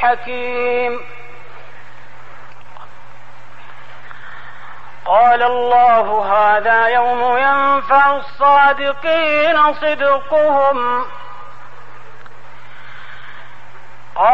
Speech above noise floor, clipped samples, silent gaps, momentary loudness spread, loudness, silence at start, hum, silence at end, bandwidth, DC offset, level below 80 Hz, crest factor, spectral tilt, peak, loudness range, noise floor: 28 dB; under 0.1%; none; 24 LU; -14 LUFS; 0 s; none; 0 s; 7.6 kHz; 6%; -54 dBFS; 14 dB; -5 dB/octave; -2 dBFS; 13 LU; -42 dBFS